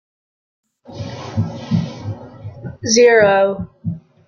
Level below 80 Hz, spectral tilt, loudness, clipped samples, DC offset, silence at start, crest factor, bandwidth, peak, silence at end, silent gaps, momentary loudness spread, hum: -54 dBFS; -4.5 dB/octave; -16 LUFS; under 0.1%; under 0.1%; 0.9 s; 18 dB; 7.2 kHz; 0 dBFS; 0.3 s; none; 21 LU; none